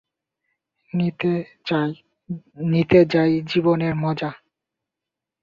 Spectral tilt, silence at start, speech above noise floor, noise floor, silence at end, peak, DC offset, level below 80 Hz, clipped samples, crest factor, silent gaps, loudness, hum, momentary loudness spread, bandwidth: -8.5 dB/octave; 0.95 s; 66 dB; -86 dBFS; 1.05 s; -2 dBFS; under 0.1%; -56 dBFS; under 0.1%; 20 dB; none; -21 LUFS; none; 17 LU; 7 kHz